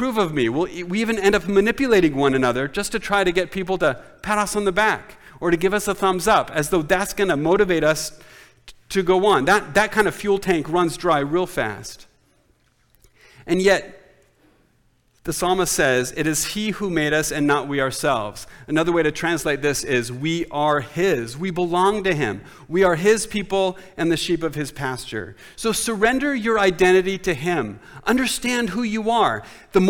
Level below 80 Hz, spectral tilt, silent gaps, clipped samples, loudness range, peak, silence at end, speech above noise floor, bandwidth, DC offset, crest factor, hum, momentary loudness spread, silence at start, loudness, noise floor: -44 dBFS; -4.5 dB/octave; none; under 0.1%; 4 LU; -6 dBFS; 0 s; 41 dB; 19 kHz; under 0.1%; 16 dB; none; 9 LU; 0 s; -20 LUFS; -61 dBFS